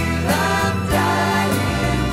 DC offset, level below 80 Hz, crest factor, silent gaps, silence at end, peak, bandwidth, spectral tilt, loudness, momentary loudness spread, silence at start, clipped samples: under 0.1%; -32 dBFS; 12 dB; none; 0 s; -6 dBFS; 16 kHz; -5 dB/octave; -18 LUFS; 2 LU; 0 s; under 0.1%